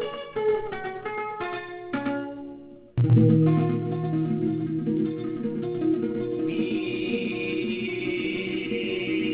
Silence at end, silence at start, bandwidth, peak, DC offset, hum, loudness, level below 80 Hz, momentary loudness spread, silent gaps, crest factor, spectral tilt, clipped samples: 0 s; 0 s; 4 kHz; -8 dBFS; under 0.1%; none; -26 LUFS; -56 dBFS; 12 LU; none; 18 dB; -11.5 dB/octave; under 0.1%